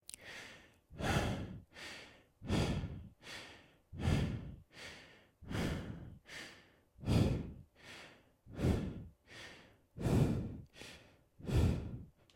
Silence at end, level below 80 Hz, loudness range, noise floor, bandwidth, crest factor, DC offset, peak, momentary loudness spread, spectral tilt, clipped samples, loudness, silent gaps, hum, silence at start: 0.25 s; -50 dBFS; 3 LU; -63 dBFS; 16.5 kHz; 22 dB; under 0.1%; -18 dBFS; 21 LU; -6.5 dB/octave; under 0.1%; -39 LUFS; none; none; 0.1 s